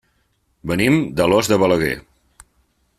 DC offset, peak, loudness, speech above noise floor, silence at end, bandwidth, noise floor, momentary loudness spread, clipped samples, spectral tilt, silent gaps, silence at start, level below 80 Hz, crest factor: under 0.1%; -2 dBFS; -17 LUFS; 48 dB; 1 s; 14.5 kHz; -65 dBFS; 11 LU; under 0.1%; -5.5 dB/octave; none; 0.65 s; -46 dBFS; 18 dB